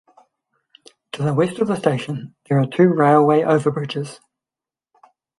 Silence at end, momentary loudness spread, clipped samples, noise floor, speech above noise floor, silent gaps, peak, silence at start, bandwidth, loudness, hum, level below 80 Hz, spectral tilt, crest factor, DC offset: 1.25 s; 15 LU; under 0.1%; -90 dBFS; 72 dB; none; -2 dBFS; 1.15 s; 11.5 kHz; -18 LUFS; none; -64 dBFS; -7.5 dB/octave; 18 dB; under 0.1%